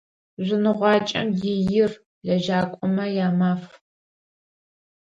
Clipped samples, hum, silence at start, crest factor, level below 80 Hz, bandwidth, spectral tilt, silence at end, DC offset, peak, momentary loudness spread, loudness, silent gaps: under 0.1%; none; 0.4 s; 18 dB; -58 dBFS; 7.6 kHz; -7 dB/octave; 1.4 s; under 0.1%; -6 dBFS; 6 LU; -22 LUFS; 2.06-2.21 s